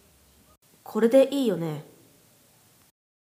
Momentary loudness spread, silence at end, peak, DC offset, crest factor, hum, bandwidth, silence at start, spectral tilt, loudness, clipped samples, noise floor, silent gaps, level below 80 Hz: 14 LU; 1.55 s; -8 dBFS; under 0.1%; 20 dB; none; 15.5 kHz; 0.9 s; -6.5 dB/octave; -23 LUFS; under 0.1%; -59 dBFS; none; -72 dBFS